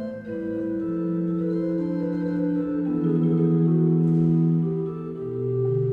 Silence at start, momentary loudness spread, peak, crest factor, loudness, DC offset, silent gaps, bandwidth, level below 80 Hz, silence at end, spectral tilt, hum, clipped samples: 0 s; 9 LU; -10 dBFS; 12 dB; -24 LUFS; under 0.1%; none; 3.3 kHz; -58 dBFS; 0 s; -12 dB/octave; none; under 0.1%